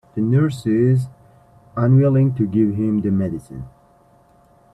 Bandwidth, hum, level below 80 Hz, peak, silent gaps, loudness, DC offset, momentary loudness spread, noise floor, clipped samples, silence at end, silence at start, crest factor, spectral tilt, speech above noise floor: 9.6 kHz; none; -52 dBFS; -4 dBFS; none; -18 LUFS; under 0.1%; 17 LU; -53 dBFS; under 0.1%; 1.05 s; 0.15 s; 14 dB; -10 dB/octave; 36 dB